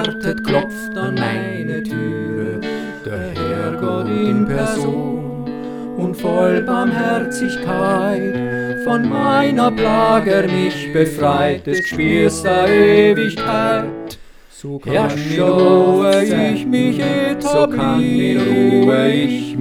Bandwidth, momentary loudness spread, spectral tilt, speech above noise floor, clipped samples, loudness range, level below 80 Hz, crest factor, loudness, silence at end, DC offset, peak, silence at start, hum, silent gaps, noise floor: 16.5 kHz; 11 LU; -6 dB/octave; 23 dB; under 0.1%; 6 LU; -44 dBFS; 16 dB; -16 LUFS; 0 s; under 0.1%; 0 dBFS; 0 s; none; none; -38 dBFS